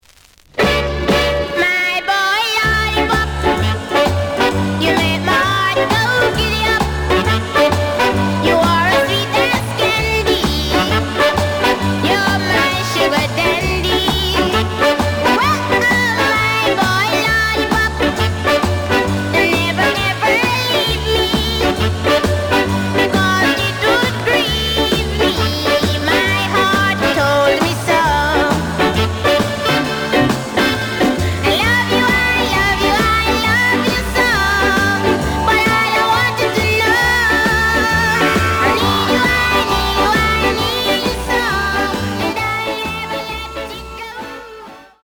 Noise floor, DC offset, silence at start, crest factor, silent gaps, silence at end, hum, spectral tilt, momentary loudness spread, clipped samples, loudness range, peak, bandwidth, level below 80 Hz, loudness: -47 dBFS; under 0.1%; 0.55 s; 14 dB; none; 0.2 s; none; -4.5 dB/octave; 4 LU; under 0.1%; 2 LU; -2 dBFS; over 20 kHz; -30 dBFS; -14 LUFS